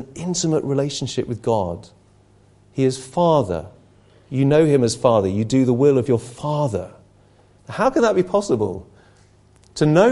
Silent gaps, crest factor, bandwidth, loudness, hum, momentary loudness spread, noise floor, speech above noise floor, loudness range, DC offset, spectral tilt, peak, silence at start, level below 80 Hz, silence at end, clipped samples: none; 18 dB; 11.5 kHz; -19 LUFS; 50 Hz at -45 dBFS; 13 LU; -53 dBFS; 35 dB; 5 LU; under 0.1%; -6 dB/octave; 0 dBFS; 0 s; -48 dBFS; 0 s; under 0.1%